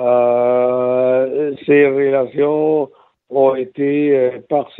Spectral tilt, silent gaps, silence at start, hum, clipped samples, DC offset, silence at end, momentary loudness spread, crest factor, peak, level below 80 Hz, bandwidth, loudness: -10.5 dB/octave; none; 0 s; none; under 0.1%; under 0.1%; 0.15 s; 7 LU; 14 dB; -2 dBFS; -66 dBFS; 4 kHz; -15 LUFS